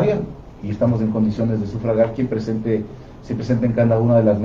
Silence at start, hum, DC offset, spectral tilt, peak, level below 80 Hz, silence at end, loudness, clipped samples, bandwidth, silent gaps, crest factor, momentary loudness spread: 0 s; none; under 0.1%; -9.5 dB/octave; -4 dBFS; -42 dBFS; 0 s; -20 LUFS; under 0.1%; 7 kHz; none; 16 dB; 14 LU